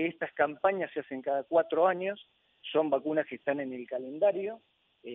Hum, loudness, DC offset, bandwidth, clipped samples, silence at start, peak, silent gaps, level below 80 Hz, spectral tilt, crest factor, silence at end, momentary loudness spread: none; -31 LUFS; under 0.1%; 3.9 kHz; under 0.1%; 0 s; -12 dBFS; none; -82 dBFS; -8.5 dB/octave; 18 dB; 0 s; 11 LU